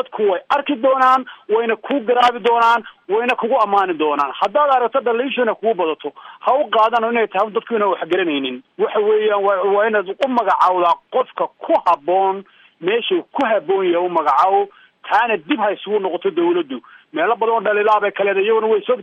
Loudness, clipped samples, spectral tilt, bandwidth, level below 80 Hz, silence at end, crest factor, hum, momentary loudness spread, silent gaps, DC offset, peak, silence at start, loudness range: -17 LUFS; under 0.1%; -5.5 dB/octave; 8.6 kHz; -68 dBFS; 0 s; 14 dB; none; 7 LU; none; under 0.1%; -4 dBFS; 0 s; 2 LU